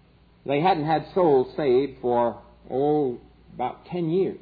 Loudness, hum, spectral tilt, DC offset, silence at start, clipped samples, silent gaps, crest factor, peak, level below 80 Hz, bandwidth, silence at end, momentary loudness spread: -24 LUFS; none; -10.5 dB/octave; under 0.1%; 0.45 s; under 0.1%; none; 16 dB; -8 dBFS; -56 dBFS; 4.9 kHz; 0.05 s; 11 LU